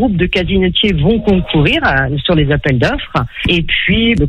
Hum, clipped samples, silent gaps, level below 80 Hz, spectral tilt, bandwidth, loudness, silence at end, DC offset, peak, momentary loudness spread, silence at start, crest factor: none; under 0.1%; none; -24 dBFS; -7 dB/octave; 9 kHz; -13 LUFS; 0 s; under 0.1%; 0 dBFS; 3 LU; 0 s; 12 dB